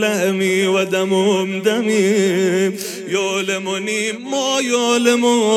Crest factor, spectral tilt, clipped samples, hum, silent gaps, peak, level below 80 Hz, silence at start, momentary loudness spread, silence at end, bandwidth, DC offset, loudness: 14 dB; -4 dB/octave; under 0.1%; none; none; -2 dBFS; -76 dBFS; 0 s; 6 LU; 0 s; 15.5 kHz; under 0.1%; -17 LUFS